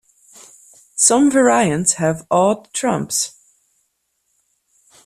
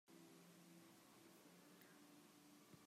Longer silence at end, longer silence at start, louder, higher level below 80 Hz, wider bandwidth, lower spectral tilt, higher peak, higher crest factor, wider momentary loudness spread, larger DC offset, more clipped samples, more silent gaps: first, 1.75 s vs 0 s; first, 0.95 s vs 0.05 s; first, -16 LUFS vs -67 LUFS; first, -58 dBFS vs under -90 dBFS; about the same, 14.5 kHz vs 15.5 kHz; about the same, -3.5 dB/octave vs -4 dB/octave; first, 0 dBFS vs -50 dBFS; about the same, 18 dB vs 16 dB; first, 8 LU vs 1 LU; neither; neither; neither